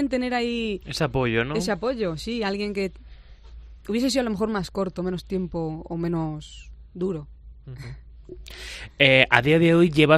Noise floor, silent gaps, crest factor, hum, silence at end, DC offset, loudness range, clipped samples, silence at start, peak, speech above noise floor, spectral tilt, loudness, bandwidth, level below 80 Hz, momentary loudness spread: -45 dBFS; none; 24 dB; none; 0 s; under 0.1%; 9 LU; under 0.1%; 0 s; 0 dBFS; 21 dB; -5.5 dB/octave; -23 LUFS; 14 kHz; -44 dBFS; 23 LU